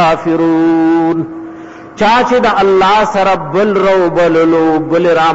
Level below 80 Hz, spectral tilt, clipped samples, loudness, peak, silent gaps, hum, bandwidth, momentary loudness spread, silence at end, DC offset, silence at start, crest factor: -44 dBFS; -6 dB/octave; under 0.1%; -10 LUFS; -4 dBFS; none; none; 8 kHz; 10 LU; 0 s; under 0.1%; 0 s; 6 dB